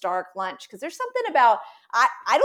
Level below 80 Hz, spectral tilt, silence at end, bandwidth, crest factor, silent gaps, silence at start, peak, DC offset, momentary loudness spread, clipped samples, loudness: -86 dBFS; -2 dB/octave; 0 s; 15.5 kHz; 16 dB; none; 0.05 s; -6 dBFS; under 0.1%; 13 LU; under 0.1%; -23 LUFS